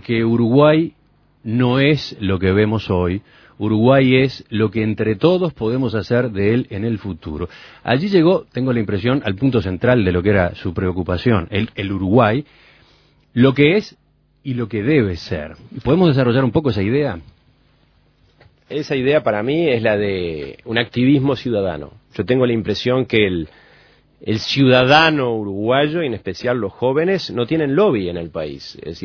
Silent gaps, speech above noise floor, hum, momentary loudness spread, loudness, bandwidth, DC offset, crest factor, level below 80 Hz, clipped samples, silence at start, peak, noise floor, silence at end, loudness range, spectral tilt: none; 39 dB; none; 14 LU; -17 LUFS; 5.4 kHz; under 0.1%; 18 dB; -44 dBFS; under 0.1%; 0.1 s; 0 dBFS; -56 dBFS; 0.05 s; 4 LU; -7.5 dB/octave